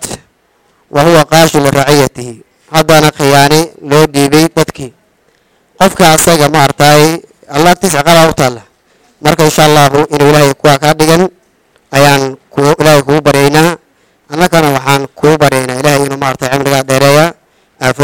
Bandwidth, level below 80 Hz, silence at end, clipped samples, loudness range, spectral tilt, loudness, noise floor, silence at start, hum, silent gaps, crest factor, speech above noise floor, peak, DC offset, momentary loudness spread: over 20 kHz; -38 dBFS; 0 s; 1%; 2 LU; -4.5 dB/octave; -8 LUFS; -52 dBFS; 0 s; none; none; 8 dB; 46 dB; 0 dBFS; 2%; 9 LU